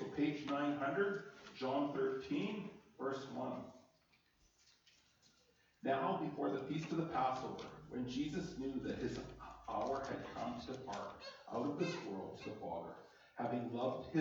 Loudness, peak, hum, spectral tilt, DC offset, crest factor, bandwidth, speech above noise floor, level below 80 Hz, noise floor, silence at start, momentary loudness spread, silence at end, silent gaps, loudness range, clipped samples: -42 LUFS; -24 dBFS; none; -6.5 dB/octave; under 0.1%; 18 dB; 20 kHz; 33 dB; -70 dBFS; -75 dBFS; 0 s; 11 LU; 0 s; none; 5 LU; under 0.1%